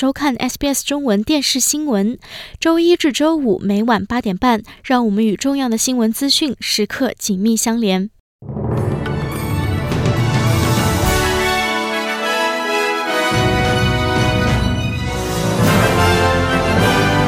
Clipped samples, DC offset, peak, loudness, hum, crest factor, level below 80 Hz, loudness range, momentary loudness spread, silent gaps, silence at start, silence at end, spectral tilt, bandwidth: under 0.1%; under 0.1%; -2 dBFS; -16 LUFS; none; 14 dB; -32 dBFS; 3 LU; 7 LU; 8.20-8.39 s; 0 s; 0 s; -4.5 dB/octave; 17.5 kHz